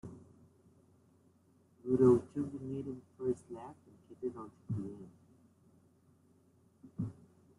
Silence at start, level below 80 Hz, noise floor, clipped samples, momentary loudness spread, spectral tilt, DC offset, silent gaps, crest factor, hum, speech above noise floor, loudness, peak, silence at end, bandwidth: 0.05 s; -72 dBFS; -68 dBFS; under 0.1%; 25 LU; -10 dB/octave; under 0.1%; none; 24 dB; none; 33 dB; -36 LUFS; -16 dBFS; 0.45 s; 11 kHz